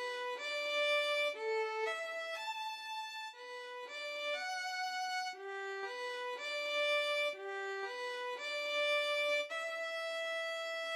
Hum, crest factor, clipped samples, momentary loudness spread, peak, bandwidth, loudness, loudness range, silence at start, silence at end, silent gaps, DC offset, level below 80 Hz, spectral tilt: none; 14 dB; under 0.1%; 10 LU; -24 dBFS; 15.5 kHz; -37 LUFS; 5 LU; 0 s; 0 s; none; under 0.1%; under -90 dBFS; 2.5 dB/octave